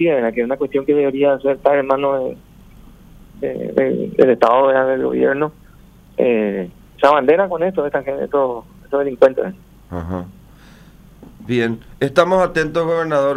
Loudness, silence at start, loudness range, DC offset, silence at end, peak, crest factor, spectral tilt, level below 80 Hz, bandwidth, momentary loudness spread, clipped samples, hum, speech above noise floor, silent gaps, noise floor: -17 LUFS; 0 s; 5 LU; under 0.1%; 0 s; 0 dBFS; 16 dB; -7 dB/octave; -46 dBFS; 10.5 kHz; 14 LU; under 0.1%; none; 28 dB; none; -45 dBFS